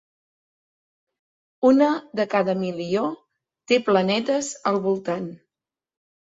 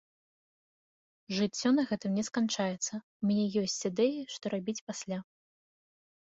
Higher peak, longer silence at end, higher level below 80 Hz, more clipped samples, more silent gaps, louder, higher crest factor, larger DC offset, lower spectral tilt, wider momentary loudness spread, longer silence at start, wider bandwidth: first, -4 dBFS vs -16 dBFS; about the same, 1 s vs 1.1 s; first, -68 dBFS vs -74 dBFS; neither; second, none vs 3.03-3.20 s, 4.81-4.87 s; first, -22 LUFS vs -32 LUFS; about the same, 20 dB vs 18 dB; neither; about the same, -5 dB/octave vs -4.5 dB/octave; about the same, 10 LU vs 9 LU; first, 1.6 s vs 1.3 s; about the same, 7.8 kHz vs 8 kHz